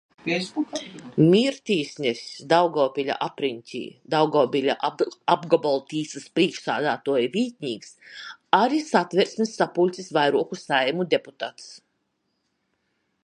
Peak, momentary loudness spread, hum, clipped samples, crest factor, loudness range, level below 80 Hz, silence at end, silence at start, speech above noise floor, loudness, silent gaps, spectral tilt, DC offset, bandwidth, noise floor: -2 dBFS; 14 LU; none; under 0.1%; 22 dB; 2 LU; -72 dBFS; 1.45 s; 0.25 s; 51 dB; -23 LUFS; none; -5 dB/octave; under 0.1%; 11 kHz; -74 dBFS